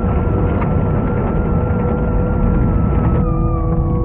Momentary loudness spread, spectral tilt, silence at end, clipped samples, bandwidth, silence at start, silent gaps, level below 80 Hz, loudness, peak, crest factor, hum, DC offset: 2 LU; -10.5 dB/octave; 0 s; under 0.1%; 3.4 kHz; 0 s; none; -20 dBFS; -17 LUFS; -4 dBFS; 12 dB; none; under 0.1%